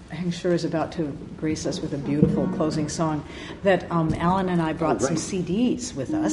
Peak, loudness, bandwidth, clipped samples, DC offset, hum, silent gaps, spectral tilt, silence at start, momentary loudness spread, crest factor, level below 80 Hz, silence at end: -4 dBFS; -25 LUFS; 11.5 kHz; under 0.1%; under 0.1%; none; none; -6 dB/octave; 0 s; 7 LU; 20 dB; -46 dBFS; 0 s